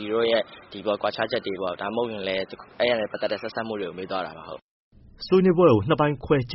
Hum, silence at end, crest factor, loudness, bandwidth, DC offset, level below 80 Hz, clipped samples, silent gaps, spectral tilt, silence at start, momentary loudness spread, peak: none; 0 s; 20 dB; -24 LUFS; 5.8 kHz; under 0.1%; -54 dBFS; under 0.1%; 4.62-4.91 s; -4.5 dB/octave; 0 s; 17 LU; -6 dBFS